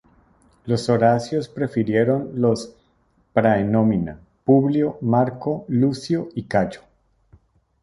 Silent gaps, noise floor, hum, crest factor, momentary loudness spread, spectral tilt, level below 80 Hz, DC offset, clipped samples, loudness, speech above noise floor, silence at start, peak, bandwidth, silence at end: none; -62 dBFS; none; 18 dB; 9 LU; -7.5 dB/octave; -52 dBFS; under 0.1%; under 0.1%; -21 LUFS; 43 dB; 0.65 s; -2 dBFS; 11.5 kHz; 1.05 s